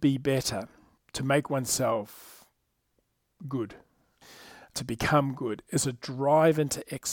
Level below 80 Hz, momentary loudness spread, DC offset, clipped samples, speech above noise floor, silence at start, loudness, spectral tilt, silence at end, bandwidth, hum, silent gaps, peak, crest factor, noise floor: -58 dBFS; 19 LU; under 0.1%; under 0.1%; 48 dB; 0 s; -28 LUFS; -4.5 dB/octave; 0 s; 19 kHz; none; none; -10 dBFS; 20 dB; -75 dBFS